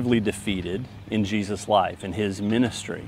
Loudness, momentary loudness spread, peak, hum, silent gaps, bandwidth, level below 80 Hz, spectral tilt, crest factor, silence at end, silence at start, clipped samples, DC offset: -25 LUFS; 7 LU; -6 dBFS; none; none; 15 kHz; -50 dBFS; -5.5 dB/octave; 18 dB; 0 s; 0 s; under 0.1%; under 0.1%